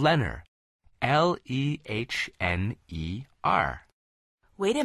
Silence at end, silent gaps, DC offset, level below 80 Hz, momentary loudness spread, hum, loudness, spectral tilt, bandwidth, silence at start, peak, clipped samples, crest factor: 0 s; 0.48-0.79 s, 3.93-4.38 s; under 0.1%; -46 dBFS; 11 LU; none; -28 LUFS; -6 dB/octave; 12.5 kHz; 0 s; -8 dBFS; under 0.1%; 20 dB